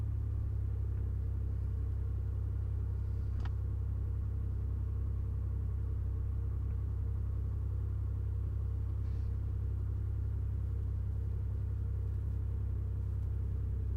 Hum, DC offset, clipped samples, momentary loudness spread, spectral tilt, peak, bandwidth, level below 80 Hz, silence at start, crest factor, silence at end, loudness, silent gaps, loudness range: none; under 0.1%; under 0.1%; 0 LU; -10 dB/octave; -28 dBFS; 2.4 kHz; -38 dBFS; 0 s; 8 dB; 0 s; -38 LUFS; none; 0 LU